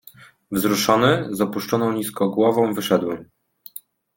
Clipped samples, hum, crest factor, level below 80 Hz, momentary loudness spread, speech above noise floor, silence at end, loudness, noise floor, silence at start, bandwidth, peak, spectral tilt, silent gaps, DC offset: under 0.1%; none; 20 dB; -58 dBFS; 20 LU; 23 dB; 0.9 s; -20 LUFS; -43 dBFS; 0.2 s; 17 kHz; -2 dBFS; -5 dB/octave; none; under 0.1%